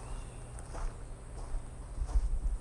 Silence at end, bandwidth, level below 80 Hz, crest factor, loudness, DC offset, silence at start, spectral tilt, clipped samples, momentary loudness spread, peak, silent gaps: 0 s; 11 kHz; -36 dBFS; 16 dB; -42 LUFS; under 0.1%; 0 s; -5.5 dB/octave; under 0.1%; 11 LU; -20 dBFS; none